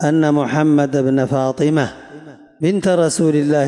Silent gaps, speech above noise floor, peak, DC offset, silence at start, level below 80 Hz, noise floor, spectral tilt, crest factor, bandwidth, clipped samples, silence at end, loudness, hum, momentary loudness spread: none; 23 dB; -4 dBFS; under 0.1%; 0 s; -58 dBFS; -38 dBFS; -6.5 dB/octave; 10 dB; 11.5 kHz; under 0.1%; 0 s; -16 LUFS; none; 5 LU